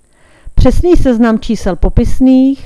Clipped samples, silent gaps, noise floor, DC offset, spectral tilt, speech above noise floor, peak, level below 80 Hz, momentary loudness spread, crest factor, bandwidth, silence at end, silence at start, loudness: 0.8%; none; -33 dBFS; under 0.1%; -7.5 dB/octave; 25 dB; 0 dBFS; -16 dBFS; 7 LU; 8 dB; 12 kHz; 0 s; 0.45 s; -11 LUFS